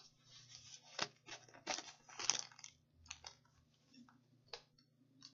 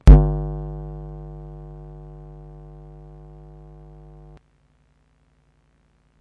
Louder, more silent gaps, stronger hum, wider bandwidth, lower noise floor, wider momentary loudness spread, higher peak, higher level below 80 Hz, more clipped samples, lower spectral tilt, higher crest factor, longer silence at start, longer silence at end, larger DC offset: second, -46 LUFS vs -21 LUFS; neither; second, none vs 50 Hz at -40 dBFS; first, 7.6 kHz vs 5 kHz; first, -74 dBFS vs -61 dBFS; about the same, 23 LU vs 21 LU; second, -12 dBFS vs 0 dBFS; second, -84 dBFS vs -22 dBFS; neither; second, 0.5 dB/octave vs -9.5 dB/octave; first, 38 dB vs 22 dB; about the same, 0 s vs 0.05 s; second, 0 s vs 5.05 s; neither